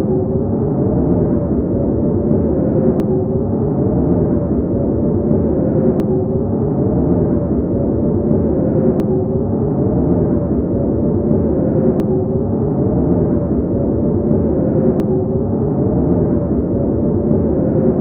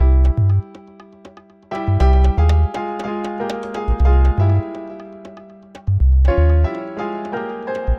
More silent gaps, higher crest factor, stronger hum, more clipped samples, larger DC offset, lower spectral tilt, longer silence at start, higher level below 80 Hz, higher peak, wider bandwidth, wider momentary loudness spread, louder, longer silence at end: neither; about the same, 14 dB vs 14 dB; neither; neither; neither; first, -13 dB/octave vs -9 dB/octave; about the same, 0 s vs 0 s; second, -28 dBFS vs -18 dBFS; first, 0 dBFS vs -4 dBFS; second, 2.9 kHz vs 6 kHz; second, 2 LU vs 16 LU; about the same, -16 LUFS vs -18 LUFS; about the same, 0 s vs 0 s